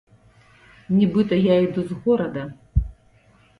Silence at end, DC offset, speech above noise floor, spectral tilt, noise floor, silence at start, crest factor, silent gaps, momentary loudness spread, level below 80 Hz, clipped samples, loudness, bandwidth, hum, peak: 0.7 s; under 0.1%; 36 dB; -9 dB/octave; -56 dBFS; 0.9 s; 16 dB; none; 10 LU; -34 dBFS; under 0.1%; -21 LUFS; 5 kHz; none; -6 dBFS